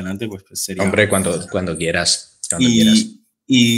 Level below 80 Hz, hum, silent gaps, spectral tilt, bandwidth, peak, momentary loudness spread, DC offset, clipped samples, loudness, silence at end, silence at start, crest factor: -48 dBFS; none; none; -3.5 dB/octave; 16 kHz; 0 dBFS; 13 LU; under 0.1%; under 0.1%; -17 LUFS; 0 s; 0 s; 16 dB